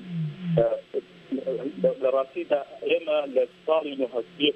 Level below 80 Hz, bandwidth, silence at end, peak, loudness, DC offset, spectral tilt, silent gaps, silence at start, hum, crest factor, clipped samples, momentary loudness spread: -62 dBFS; 8.2 kHz; 0.05 s; -8 dBFS; -27 LUFS; under 0.1%; -8 dB/octave; none; 0 s; none; 18 dB; under 0.1%; 8 LU